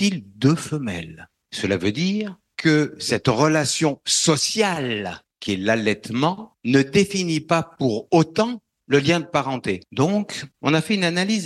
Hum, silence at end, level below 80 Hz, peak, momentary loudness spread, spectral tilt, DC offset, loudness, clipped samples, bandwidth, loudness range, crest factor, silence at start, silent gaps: none; 0 s; -56 dBFS; -4 dBFS; 9 LU; -4.5 dB/octave; under 0.1%; -21 LUFS; under 0.1%; 12.5 kHz; 2 LU; 18 dB; 0 s; none